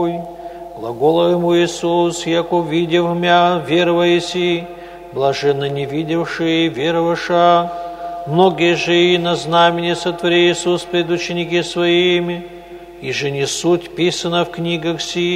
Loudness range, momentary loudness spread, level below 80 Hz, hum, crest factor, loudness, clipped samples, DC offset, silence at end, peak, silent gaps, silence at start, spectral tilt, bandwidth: 3 LU; 14 LU; -50 dBFS; none; 16 dB; -16 LUFS; under 0.1%; under 0.1%; 0 s; 0 dBFS; none; 0 s; -5 dB/octave; 12.5 kHz